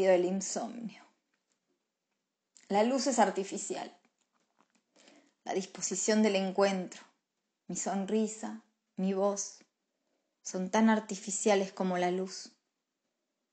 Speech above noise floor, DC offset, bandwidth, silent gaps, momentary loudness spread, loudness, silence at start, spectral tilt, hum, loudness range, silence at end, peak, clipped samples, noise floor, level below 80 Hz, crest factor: 55 dB; under 0.1%; 9.4 kHz; none; 17 LU; -32 LUFS; 0 s; -4 dB/octave; none; 3 LU; 1.05 s; -14 dBFS; under 0.1%; -86 dBFS; -86 dBFS; 20 dB